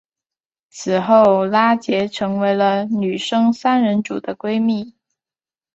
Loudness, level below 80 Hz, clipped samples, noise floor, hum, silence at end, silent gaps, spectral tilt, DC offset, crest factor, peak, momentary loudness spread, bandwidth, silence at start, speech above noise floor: -17 LUFS; -62 dBFS; under 0.1%; under -90 dBFS; none; 0.85 s; none; -6 dB/octave; under 0.1%; 16 dB; -2 dBFS; 11 LU; 8 kHz; 0.75 s; over 73 dB